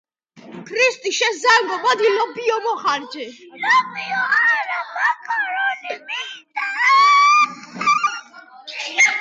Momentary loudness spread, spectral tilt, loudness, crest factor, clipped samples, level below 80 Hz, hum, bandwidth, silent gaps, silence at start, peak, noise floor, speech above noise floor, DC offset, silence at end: 15 LU; -0.5 dB/octave; -17 LUFS; 16 dB; under 0.1%; -80 dBFS; none; 9.4 kHz; none; 0.35 s; -4 dBFS; -44 dBFS; 25 dB; under 0.1%; 0 s